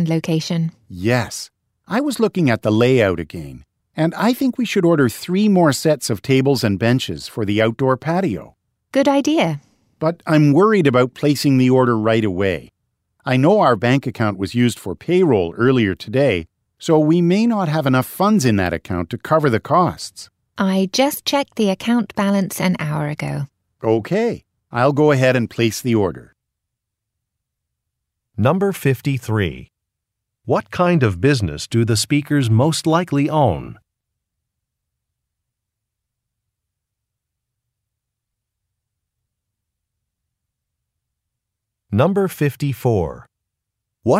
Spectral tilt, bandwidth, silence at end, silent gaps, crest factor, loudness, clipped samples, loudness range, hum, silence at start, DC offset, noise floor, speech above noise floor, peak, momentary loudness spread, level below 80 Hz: -6 dB/octave; 16 kHz; 0 s; none; 16 dB; -18 LUFS; under 0.1%; 6 LU; none; 0 s; under 0.1%; -81 dBFS; 64 dB; -2 dBFS; 11 LU; -50 dBFS